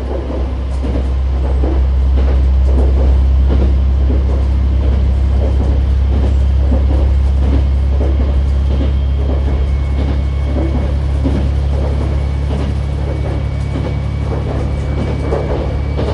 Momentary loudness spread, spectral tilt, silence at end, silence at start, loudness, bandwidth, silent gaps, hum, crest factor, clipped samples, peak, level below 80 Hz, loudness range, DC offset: 5 LU; -8.5 dB/octave; 0 s; 0 s; -15 LUFS; 5.8 kHz; none; none; 10 dB; under 0.1%; -2 dBFS; -14 dBFS; 4 LU; under 0.1%